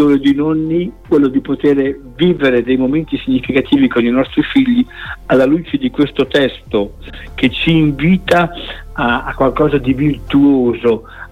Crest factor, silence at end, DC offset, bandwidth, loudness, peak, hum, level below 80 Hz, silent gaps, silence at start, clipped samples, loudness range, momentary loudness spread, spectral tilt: 14 dB; 0.05 s; under 0.1%; 9 kHz; -14 LUFS; 0 dBFS; none; -34 dBFS; none; 0 s; under 0.1%; 1 LU; 7 LU; -7.5 dB/octave